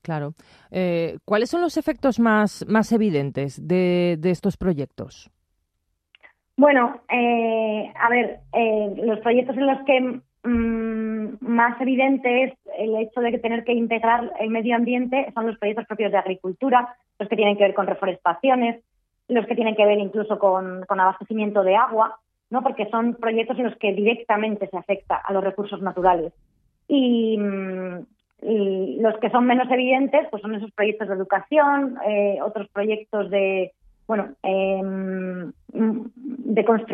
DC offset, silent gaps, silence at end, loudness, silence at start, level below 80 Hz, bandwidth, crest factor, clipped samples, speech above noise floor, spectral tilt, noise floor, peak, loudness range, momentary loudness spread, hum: under 0.1%; none; 0 s; -22 LUFS; 0.05 s; -56 dBFS; 10 kHz; 20 dB; under 0.1%; 53 dB; -7 dB/octave; -75 dBFS; -2 dBFS; 3 LU; 10 LU; none